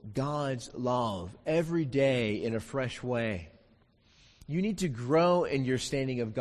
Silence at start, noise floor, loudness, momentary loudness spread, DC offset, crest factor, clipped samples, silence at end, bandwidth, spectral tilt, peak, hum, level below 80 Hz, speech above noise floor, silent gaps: 0.05 s; -64 dBFS; -31 LUFS; 8 LU; under 0.1%; 16 dB; under 0.1%; 0 s; 13 kHz; -6 dB/octave; -14 dBFS; none; -56 dBFS; 34 dB; none